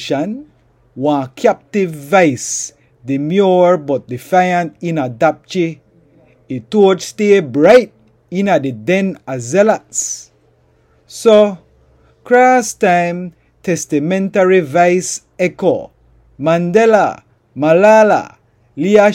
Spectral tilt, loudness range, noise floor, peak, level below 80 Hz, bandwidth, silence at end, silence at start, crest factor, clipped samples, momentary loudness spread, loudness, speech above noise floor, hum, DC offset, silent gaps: -5 dB/octave; 3 LU; -53 dBFS; 0 dBFS; -56 dBFS; 16 kHz; 0 s; 0 s; 14 dB; under 0.1%; 15 LU; -13 LUFS; 41 dB; none; under 0.1%; none